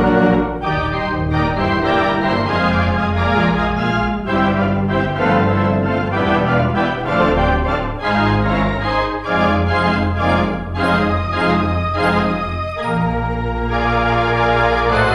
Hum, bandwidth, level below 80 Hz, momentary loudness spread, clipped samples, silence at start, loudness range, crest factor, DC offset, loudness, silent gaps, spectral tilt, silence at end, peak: none; 12 kHz; -30 dBFS; 5 LU; under 0.1%; 0 s; 1 LU; 14 dB; under 0.1%; -17 LUFS; none; -7.5 dB/octave; 0 s; -2 dBFS